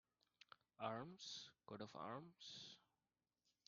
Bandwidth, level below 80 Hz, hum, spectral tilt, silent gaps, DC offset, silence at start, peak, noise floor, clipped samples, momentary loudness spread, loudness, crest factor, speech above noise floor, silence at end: 7.2 kHz; under -90 dBFS; none; -3 dB/octave; none; under 0.1%; 0.5 s; -32 dBFS; under -90 dBFS; under 0.1%; 17 LU; -54 LUFS; 24 dB; over 35 dB; 0.9 s